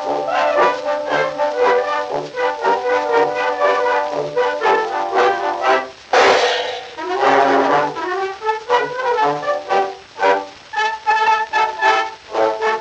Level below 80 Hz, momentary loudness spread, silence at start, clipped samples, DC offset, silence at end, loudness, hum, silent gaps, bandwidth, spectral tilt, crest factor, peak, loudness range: -60 dBFS; 7 LU; 0 s; under 0.1%; under 0.1%; 0 s; -17 LUFS; none; none; 8.6 kHz; -3 dB/octave; 16 dB; 0 dBFS; 2 LU